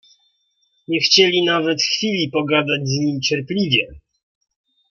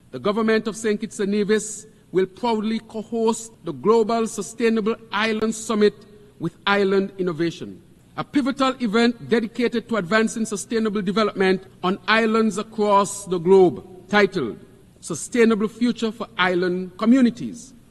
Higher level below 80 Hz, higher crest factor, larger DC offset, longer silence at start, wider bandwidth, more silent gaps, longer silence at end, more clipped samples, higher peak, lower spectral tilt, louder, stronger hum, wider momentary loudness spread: about the same, -56 dBFS vs -58 dBFS; about the same, 20 dB vs 20 dB; neither; first, 0.9 s vs 0.15 s; second, 7.2 kHz vs 12.5 kHz; neither; first, 0.9 s vs 0.2 s; neither; about the same, 0 dBFS vs -2 dBFS; about the same, -4 dB/octave vs -5 dB/octave; first, -17 LUFS vs -21 LUFS; neither; second, 8 LU vs 12 LU